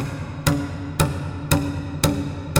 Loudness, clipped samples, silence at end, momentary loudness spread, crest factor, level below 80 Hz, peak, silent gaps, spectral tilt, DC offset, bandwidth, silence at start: -24 LUFS; under 0.1%; 0 s; 6 LU; 22 dB; -38 dBFS; 0 dBFS; none; -5 dB/octave; under 0.1%; over 20 kHz; 0 s